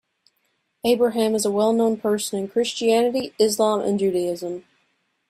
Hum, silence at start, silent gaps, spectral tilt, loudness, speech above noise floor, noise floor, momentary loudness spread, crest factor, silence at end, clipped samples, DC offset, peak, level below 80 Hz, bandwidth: none; 0.85 s; none; -4.5 dB/octave; -21 LUFS; 50 dB; -71 dBFS; 8 LU; 16 dB; 0.7 s; under 0.1%; under 0.1%; -6 dBFS; -64 dBFS; 15.5 kHz